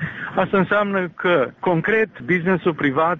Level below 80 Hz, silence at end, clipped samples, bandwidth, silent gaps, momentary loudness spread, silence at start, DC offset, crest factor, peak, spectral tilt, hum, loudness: -54 dBFS; 0 s; under 0.1%; 6.4 kHz; none; 4 LU; 0 s; under 0.1%; 16 dB; -4 dBFS; -5 dB/octave; none; -20 LUFS